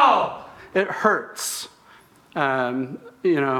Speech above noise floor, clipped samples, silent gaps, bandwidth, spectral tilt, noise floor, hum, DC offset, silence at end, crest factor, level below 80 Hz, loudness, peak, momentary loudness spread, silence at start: 29 dB; under 0.1%; none; 19 kHz; -4 dB/octave; -52 dBFS; none; under 0.1%; 0 s; 20 dB; -66 dBFS; -24 LUFS; -4 dBFS; 13 LU; 0 s